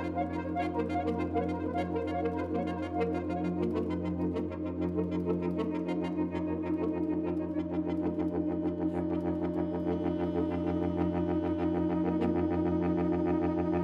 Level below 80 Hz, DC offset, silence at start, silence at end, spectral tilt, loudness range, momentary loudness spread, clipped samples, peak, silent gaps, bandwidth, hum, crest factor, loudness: -52 dBFS; under 0.1%; 0 s; 0 s; -9.5 dB/octave; 2 LU; 4 LU; under 0.1%; -18 dBFS; none; 6 kHz; none; 12 dB; -32 LUFS